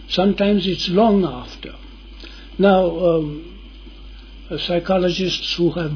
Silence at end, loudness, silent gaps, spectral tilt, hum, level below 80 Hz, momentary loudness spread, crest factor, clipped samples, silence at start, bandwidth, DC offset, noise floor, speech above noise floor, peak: 0 s; -18 LUFS; none; -6.5 dB/octave; none; -38 dBFS; 20 LU; 18 dB; under 0.1%; 0 s; 5.4 kHz; under 0.1%; -38 dBFS; 20 dB; -2 dBFS